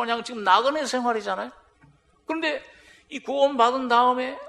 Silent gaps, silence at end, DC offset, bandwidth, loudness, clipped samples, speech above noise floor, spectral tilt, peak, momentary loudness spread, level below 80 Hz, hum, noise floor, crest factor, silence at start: none; 0 s; under 0.1%; 12.5 kHz; -23 LUFS; under 0.1%; 35 dB; -2.5 dB/octave; -4 dBFS; 16 LU; -66 dBFS; none; -58 dBFS; 20 dB; 0 s